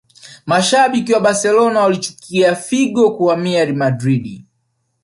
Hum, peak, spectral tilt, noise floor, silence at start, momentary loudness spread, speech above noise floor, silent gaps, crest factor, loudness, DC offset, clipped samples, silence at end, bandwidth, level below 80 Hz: none; -2 dBFS; -4.5 dB/octave; -67 dBFS; 0.25 s; 8 LU; 53 dB; none; 14 dB; -15 LUFS; under 0.1%; under 0.1%; 0.65 s; 11.5 kHz; -58 dBFS